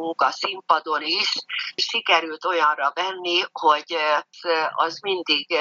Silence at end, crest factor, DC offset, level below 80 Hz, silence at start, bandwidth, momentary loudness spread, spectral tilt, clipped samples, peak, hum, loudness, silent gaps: 0 s; 20 dB; under 0.1%; -86 dBFS; 0 s; 7.6 kHz; 5 LU; -1 dB/octave; under 0.1%; -4 dBFS; none; -22 LUFS; none